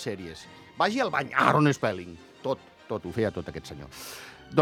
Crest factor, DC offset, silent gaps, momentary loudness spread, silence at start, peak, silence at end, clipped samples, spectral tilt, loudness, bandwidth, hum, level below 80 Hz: 26 dB; under 0.1%; none; 19 LU; 0 s; -4 dBFS; 0 s; under 0.1%; -5.5 dB/octave; -27 LUFS; 17 kHz; none; -58 dBFS